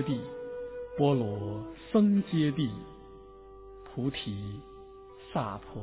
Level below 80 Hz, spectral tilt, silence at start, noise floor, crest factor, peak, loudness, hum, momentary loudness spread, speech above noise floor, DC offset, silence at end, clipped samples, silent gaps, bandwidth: -56 dBFS; -7 dB/octave; 0 s; -50 dBFS; 18 dB; -14 dBFS; -31 LUFS; none; 24 LU; 20 dB; under 0.1%; 0 s; under 0.1%; none; 4 kHz